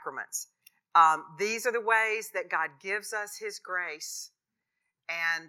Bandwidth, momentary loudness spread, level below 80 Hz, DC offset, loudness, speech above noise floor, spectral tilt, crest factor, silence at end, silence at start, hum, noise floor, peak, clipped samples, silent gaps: 17.5 kHz; 16 LU; under -90 dBFS; under 0.1%; -29 LUFS; 55 dB; -1 dB/octave; 22 dB; 0 s; 0 s; none; -85 dBFS; -8 dBFS; under 0.1%; none